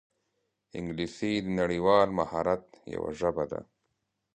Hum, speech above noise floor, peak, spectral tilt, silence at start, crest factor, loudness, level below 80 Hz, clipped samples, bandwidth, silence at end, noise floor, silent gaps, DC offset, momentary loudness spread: none; 51 dB; -10 dBFS; -6.5 dB/octave; 0.75 s; 22 dB; -29 LUFS; -56 dBFS; under 0.1%; 9.6 kHz; 0.7 s; -80 dBFS; none; under 0.1%; 15 LU